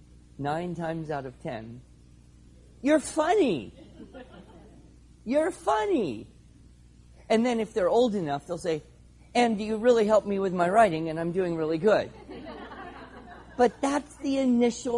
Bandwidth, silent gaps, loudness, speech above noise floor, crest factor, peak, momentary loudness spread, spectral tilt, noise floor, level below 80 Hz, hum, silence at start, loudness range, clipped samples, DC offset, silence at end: 11.5 kHz; none; -26 LUFS; 28 dB; 20 dB; -8 dBFS; 19 LU; -5.5 dB/octave; -54 dBFS; -56 dBFS; none; 0.4 s; 6 LU; under 0.1%; under 0.1%; 0 s